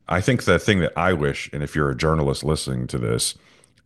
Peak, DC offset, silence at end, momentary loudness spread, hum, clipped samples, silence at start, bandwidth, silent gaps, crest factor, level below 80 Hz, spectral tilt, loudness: -2 dBFS; under 0.1%; 0.55 s; 7 LU; none; under 0.1%; 0.1 s; 12.5 kHz; none; 20 dB; -38 dBFS; -5 dB/octave; -22 LUFS